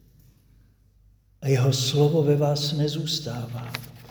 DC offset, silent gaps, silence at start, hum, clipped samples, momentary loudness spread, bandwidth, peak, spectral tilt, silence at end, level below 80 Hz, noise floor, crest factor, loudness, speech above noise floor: under 0.1%; none; 1.4 s; none; under 0.1%; 13 LU; over 20 kHz; -8 dBFS; -5.5 dB/octave; 0.05 s; -56 dBFS; -58 dBFS; 18 dB; -24 LUFS; 35 dB